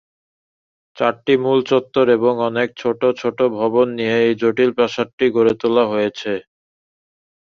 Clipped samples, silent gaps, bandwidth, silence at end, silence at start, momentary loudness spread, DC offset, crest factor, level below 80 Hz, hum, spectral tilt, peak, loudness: under 0.1%; 5.13-5.18 s; 7 kHz; 1.15 s; 0.95 s; 5 LU; under 0.1%; 16 dB; -60 dBFS; none; -6.5 dB/octave; -2 dBFS; -17 LUFS